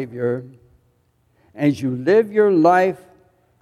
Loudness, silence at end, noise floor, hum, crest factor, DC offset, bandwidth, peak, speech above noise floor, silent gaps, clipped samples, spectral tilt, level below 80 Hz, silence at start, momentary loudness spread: -18 LUFS; 0.65 s; -62 dBFS; none; 16 dB; under 0.1%; 13 kHz; -2 dBFS; 45 dB; none; under 0.1%; -7.5 dB/octave; -64 dBFS; 0 s; 10 LU